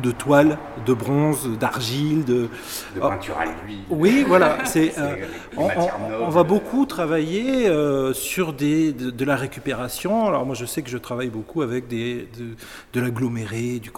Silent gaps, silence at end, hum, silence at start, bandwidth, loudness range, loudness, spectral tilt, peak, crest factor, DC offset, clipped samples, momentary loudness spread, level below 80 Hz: none; 0 s; none; 0 s; 18 kHz; 6 LU; -22 LUFS; -5.5 dB/octave; -2 dBFS; 20 dB; under 0.1%; under 0.1%; 11 LU; -50 dBFS